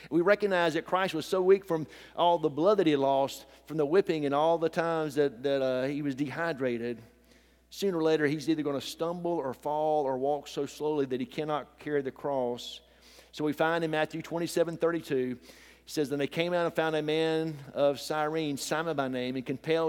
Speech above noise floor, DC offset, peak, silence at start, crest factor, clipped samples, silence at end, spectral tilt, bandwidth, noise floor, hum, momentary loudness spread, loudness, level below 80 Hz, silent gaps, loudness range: 32 dB; under 0.1%; -10 dBFS; 0 s; 18 dB; under 0.1%; 0 s; -5.5 dB/octave; 17 kHz; -61 dBFS; none; 9 LU; -30 LUFS; -66 dBFS; none; 5 LU